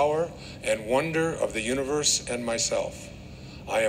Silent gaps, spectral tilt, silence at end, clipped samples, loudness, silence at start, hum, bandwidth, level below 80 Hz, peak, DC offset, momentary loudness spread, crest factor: none; -3 dB/octave; 0 s; under 0.1%; -27 LUFS; 0 s; none; 16 kHz; -50 dBFS; -10 dBFS; under 0.1%; 18 LU; 18 dB